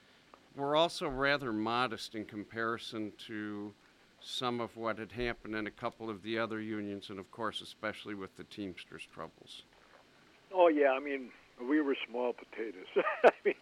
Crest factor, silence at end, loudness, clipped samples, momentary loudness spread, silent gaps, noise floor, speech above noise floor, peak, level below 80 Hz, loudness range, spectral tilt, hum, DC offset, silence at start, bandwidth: 24 dB; 0.05 s; -35 LUFS; under 0.1%; 19 LU; none; -63 dBFS; 28 dB; -10 dBFS; -64 dBFS; 9 LU; -5 dB/octave; none; under 0.1%; 0.55 s; 14.5 kHz